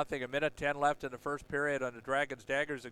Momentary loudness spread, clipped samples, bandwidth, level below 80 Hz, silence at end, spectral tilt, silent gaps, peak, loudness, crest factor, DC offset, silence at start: 6 LU; under 0.1%; 14 kHz; -62 dBFS; 0 s; -4.5 dB/octave; none; -16 dBFS; -35 LUFS; 18 dB; under 0.1%; 0 s